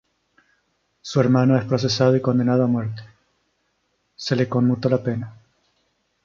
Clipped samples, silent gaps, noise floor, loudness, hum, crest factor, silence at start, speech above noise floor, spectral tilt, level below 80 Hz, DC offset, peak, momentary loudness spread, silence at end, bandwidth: under 0.1%; none; -70 dBFS; -20 LUFS; none; 18 dB; 1.05 s; 51 dB; -7 dB/octave; -58 dBFS; under 0.1%; -4 dBFS; 14 LU; 0.9 s; 7.4 kHz